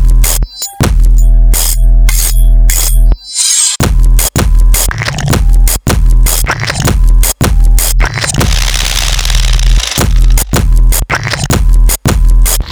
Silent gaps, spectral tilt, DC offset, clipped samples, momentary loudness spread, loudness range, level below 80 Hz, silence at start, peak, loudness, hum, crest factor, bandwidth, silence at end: none; -3 dB/octave; under 0.1%; 2%; 3 LU; 1 LU; -8 dBFS; 0 s; 0 dBFS; -10 LUFS; none; 6 dB; 20 kHz; 0 s